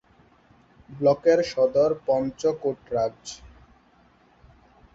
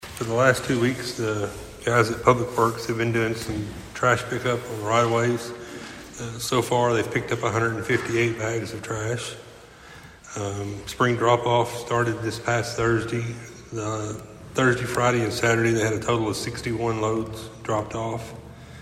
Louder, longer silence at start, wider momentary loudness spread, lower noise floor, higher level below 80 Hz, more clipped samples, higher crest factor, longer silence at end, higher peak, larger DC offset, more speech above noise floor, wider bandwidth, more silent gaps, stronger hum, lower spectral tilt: about the same, -24 LUFS vs -24 LUFS; first, 0.9 s vs 0 s; about the same, 13 LU vs 14 LU; first, -59 dBFS vs -45 dBFS; second, -58 dBFS vs -50 dBFS; neither; about the same, 18 dB vs 22 dB; first, 1.5 s vs 0 s; second, -8 dBFS vs -2 dBFS; neither; first, 36 dB vs 22 dB; second, 7.8 kHz vs 16 kHz; neither; neither; about the same, -5.5 dB/octave vs -5 dB/octave